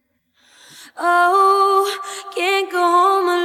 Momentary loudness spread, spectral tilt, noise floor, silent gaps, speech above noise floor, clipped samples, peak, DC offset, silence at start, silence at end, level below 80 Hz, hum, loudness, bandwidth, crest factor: 10 LU; -0.5 dB/octave; -60 dBFS; none; 43 dB; under 0.1%; -4 dBFS; under 0.1%; 0.8 s; 0 s; -80 dBFS; none; -16 LUFS; 16 kHz; 14 dB